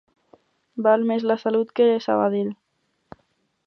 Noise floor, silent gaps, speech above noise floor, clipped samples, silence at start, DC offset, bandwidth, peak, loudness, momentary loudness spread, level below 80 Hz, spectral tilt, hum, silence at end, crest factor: -72 dBFS; none; 51 dB; under 0.1%; 0.75 s; under 0.1%; 6.2 kHz; -6 dBFS; -21 LUFS; 11 LU; -72 dBFS; -7.5 dB/octave; none; 1.15 s; 18 dB